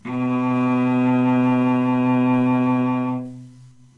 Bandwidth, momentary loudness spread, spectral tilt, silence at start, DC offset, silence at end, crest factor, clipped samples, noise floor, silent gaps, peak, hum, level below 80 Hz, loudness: 4.1 kHz; 6 LU; -9 dB/octave; 0.05 s; under 0.1%; 0.3 s; 10 dB; under 0.1%; -46 dBFS; none; -10 dBFS; none; -66 dBFS; -19 LUFS